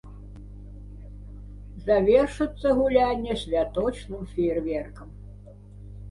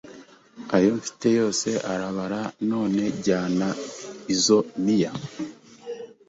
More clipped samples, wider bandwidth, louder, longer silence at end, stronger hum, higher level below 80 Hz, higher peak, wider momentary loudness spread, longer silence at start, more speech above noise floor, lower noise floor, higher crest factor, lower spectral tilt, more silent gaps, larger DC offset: neither; first, 11.5 kHz vs 8.2 kHz; about the same, -24 LUFS vs -24 LUFS; second, 0 s vs 0.15 s; first, 50 Hz at -40 dBFS vs none; first, -42 dBFS vs -62 dBFS; about the same, -8 dBFS vs -6 dBFS; first, 24 LU vs 16 LU; about the same, 0.05 s vs 0.05 s; about the same, 21 dB vs 24 dB; about the same, -45 dBFS vs -47 dBFS; about the same, 20 dB vs 20 dB; first, -7 dB/octave vs -4.5 dB/octave; neither; neither